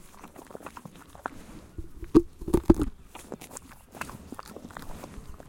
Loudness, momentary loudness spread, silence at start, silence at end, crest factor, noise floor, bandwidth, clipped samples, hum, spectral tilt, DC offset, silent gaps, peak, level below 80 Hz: -28 LUFS; 23 LU; 0.15 s; 0 s; 28 dB; -48 dBFS; 17 kHz; under 0.1%; none; -7 dB/octave; under 0.1%; none; -4 dBFS; -40 dBFS